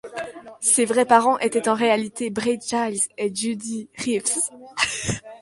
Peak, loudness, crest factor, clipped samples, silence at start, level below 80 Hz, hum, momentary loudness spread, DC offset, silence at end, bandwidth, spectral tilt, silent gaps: -2 dBFS; -22 LUFS; 22 dB; under 0.1%; 0.05 s; -56 dBFS; none; 12 LU; under 0.1%; 0.05 s; 11.5 kHz; -2.5 dB/octave; none